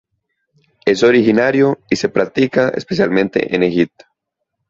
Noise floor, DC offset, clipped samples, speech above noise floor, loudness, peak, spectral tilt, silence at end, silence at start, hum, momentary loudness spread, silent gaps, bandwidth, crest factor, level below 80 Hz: -75 dBFS; under 0.1%; under 0.1%; 61 dB; -15 LUFS; -2 dBFS; -6 dB/octave; 0.85 s; 0.85 s; none; 7 LU; none; 7.8 kHz; 14 dB; -52 dBFS